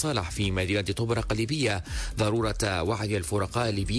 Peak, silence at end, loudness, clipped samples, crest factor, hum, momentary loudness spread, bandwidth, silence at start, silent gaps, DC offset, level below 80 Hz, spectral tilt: -14 dBFS; 0 s; -28 LUFS; under 0.1%; 12 dB; none; 2 LU; 11 kHz; 0 s; none; under 0.1%; -40 dBFS; -5 dB/octave